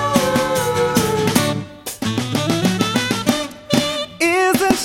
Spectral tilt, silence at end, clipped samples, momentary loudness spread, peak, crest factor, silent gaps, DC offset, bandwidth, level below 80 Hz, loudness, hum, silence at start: -4 dB/octave; 0 s; under 0.1%; 7 LU; 0 dBFS; 18 dB; none; under 0.1%; 17 kHz; -46 dBFS; -18 LUFS; none; 0 s